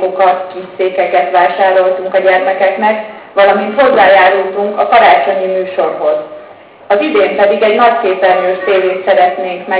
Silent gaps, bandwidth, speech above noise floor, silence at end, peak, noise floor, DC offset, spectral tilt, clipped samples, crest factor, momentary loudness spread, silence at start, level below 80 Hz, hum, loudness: none; 4 kHz; 25 dB; 0 s; 0 dBFS; -35 dBFS; under 0.1%; -7.5 dB/octave; under 0.1%; 10 dB; 9 LU; 0 s; -58 dBFS; none; -10 LUFS